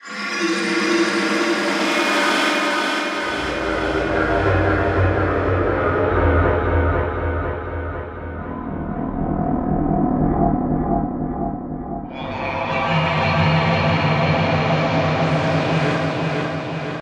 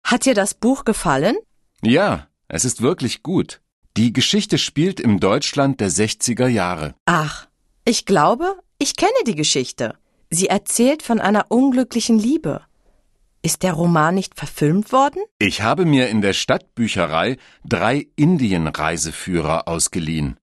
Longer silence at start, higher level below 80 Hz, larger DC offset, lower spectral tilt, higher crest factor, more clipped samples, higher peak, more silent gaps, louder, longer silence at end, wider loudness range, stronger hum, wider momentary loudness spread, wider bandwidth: about the same, 0.05 s vs 0.05 s; first, -32 dBFS vs -46 dBFS; neither; first, -6 dB/octave vs -4.5 dB/octave; about the same, 14 dB vs 16 dB; neither; about the same, -4 dBFS vs -2 dBFS; second, none vs 3.72-3.82 s, 7.00-7.06 s, 15.31-15.40 s; about the same, -20 LUFS vs -18 LUFS; about the same, 0 s vs 0.1 s; about the same, 4 LU vs 2 LU; neither; about the same, 10 LU vs 8 LU; about the same, 13.5 kHz vs 12.5 kHz